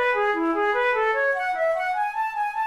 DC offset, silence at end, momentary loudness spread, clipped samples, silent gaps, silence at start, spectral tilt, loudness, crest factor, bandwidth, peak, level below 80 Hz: 0.1%; 0 s; 4 LU; under 0.1%; none; 0 s; -3.5 dB/octave; -23 LUFS; 10 dB; 14 kHz; -14 dBFS; -58 dBFS